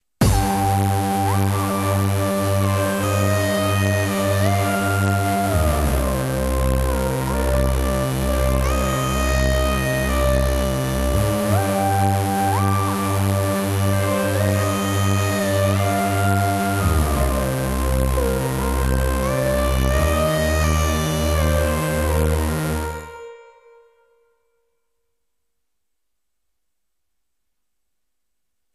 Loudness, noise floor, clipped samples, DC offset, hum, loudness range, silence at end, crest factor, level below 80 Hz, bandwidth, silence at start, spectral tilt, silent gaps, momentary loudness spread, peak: -20 LUFS; -81 dBFS; under 0.1%; under 0.1%; none; 2 LU; 5.3 s; 14 dB; -26 dBFS; 15.5 kHz; 0.2 s; -5.5 dB/octave; none; 3 LU; -4 dBFS